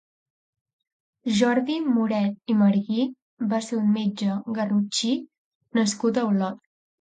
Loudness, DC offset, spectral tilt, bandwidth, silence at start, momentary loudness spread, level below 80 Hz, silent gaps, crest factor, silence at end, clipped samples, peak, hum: -24 LUFS; under 0.1%; -5.5 dB/octave; 9.4 kHz; 1.25 s; 8 LU; -70 dBFS; 3.22-3.37 s, 5.38-5.61 s; 16 dB; 0.45 s; under 0.1%; -8 dBFS; none